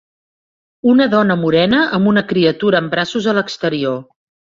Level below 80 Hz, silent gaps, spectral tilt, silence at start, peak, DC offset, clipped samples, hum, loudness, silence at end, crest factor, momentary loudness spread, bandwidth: -54 dBFS; none; -6.5 dB/octave; 0.85 s; -2 dBFS; under 0.1%; under 0.1%; none; -15 LUFS; 0.55 s; 14 dB; 7 LU; 7.6 kHz